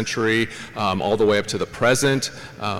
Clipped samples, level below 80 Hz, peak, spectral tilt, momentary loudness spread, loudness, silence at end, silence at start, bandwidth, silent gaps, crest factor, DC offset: under 0.1%; -50 dBFS; -2 dBFS; -4 dB/octave; 9 LU; -21 LUFS; 0 s; 0 s; 16.5 kHz; none; 18 dB; under 0.1%